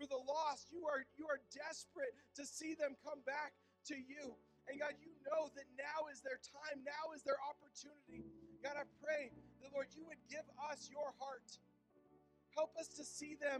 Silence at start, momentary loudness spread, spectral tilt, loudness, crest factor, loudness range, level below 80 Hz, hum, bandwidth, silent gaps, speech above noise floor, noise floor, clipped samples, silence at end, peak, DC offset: 0 s; 13 LU; -2.5 dB/octave; -47 LUFS; 18 dB; 3 LU; -84 dBFS; none; 12.5 kHz; none; 24 dB; -72 dBFS; under 0.1%; 0 s; -30 dBFS; under 0.1%